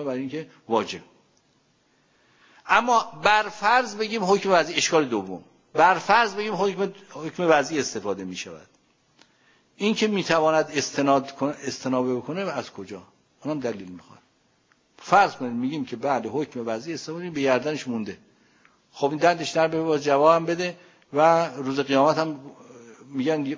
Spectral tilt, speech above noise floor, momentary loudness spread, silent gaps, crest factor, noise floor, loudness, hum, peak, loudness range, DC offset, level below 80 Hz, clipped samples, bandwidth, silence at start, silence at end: -4 dB/octave; 41 dB; 16 LU; none; 20 dB; -65 dBFS; -23 LUFS; none; -4 dBFS; 6 LU; under 0.1%; -66 dBFS; under 0.1%; 7.8 kHz; 0 s; 0 s